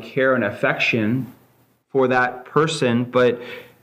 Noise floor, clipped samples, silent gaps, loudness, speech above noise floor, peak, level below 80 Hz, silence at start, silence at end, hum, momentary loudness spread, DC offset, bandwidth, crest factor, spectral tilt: -59 dBFS; under 0.1%; none; -20 LUFS; 39 dB; -4 dBFS; -64 dBFS; 0 s; 0.2 s; none; 8 LU; under 0.1%; 15.5 kHz; 18 dB; -5.5 dB/octave